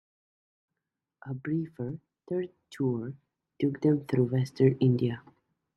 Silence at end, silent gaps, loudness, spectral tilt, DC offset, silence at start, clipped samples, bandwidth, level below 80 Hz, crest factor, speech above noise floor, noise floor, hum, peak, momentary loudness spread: 0.55 s; none; -29 LUFS; -9 dB/octave; under 0.1%; 1.25 s; under 0.1%; 8.4 kHz; -68 dBFS; 20 dB; 59 dB; -87 dBFS; none; -10 dBFS; 16 LU